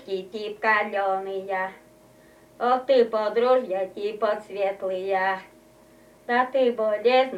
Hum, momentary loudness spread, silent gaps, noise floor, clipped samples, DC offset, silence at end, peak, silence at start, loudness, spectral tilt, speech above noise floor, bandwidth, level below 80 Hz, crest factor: none; 10 LU; none; -53 dBFS; under 0.1%; under 0.1%; 0 s; -8 dBFS; 0 s; -24 LUFS; -5 dB/octave; 29 dB; 11.5 kHz; -70 dBFS; 16 dB